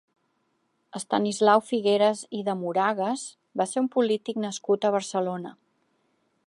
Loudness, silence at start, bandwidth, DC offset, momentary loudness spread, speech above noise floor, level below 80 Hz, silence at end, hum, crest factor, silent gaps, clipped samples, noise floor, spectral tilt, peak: -25 LUFS; 0.95 s; 11.5 kHz; under 0.1%; 13 LU; 47 dB; -80 dBFS; 0.95 s; none; 20 dB; none; under 0.1%; -72 dBFS; -4.5 dB/octave; -8 dBFS